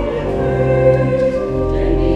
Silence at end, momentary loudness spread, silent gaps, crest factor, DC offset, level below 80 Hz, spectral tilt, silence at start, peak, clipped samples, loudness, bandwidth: 0 s; 6 LU; none; 14 dB; under 0.1%; -24 dBFS; -9 dB/octave; 0 s; 0 dBFS; under 0.1%; -16 LUFS; 8.4 kHz